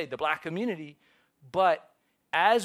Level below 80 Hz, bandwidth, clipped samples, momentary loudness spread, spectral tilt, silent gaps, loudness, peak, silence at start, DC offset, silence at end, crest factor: -72 dBFS; 15 kHz; under 0.1%; 10 LU; -4.5 dB/octave; none; -29 LUFS; -10 dBFS; 0 s; under 0.1%; 0 s; 20 dB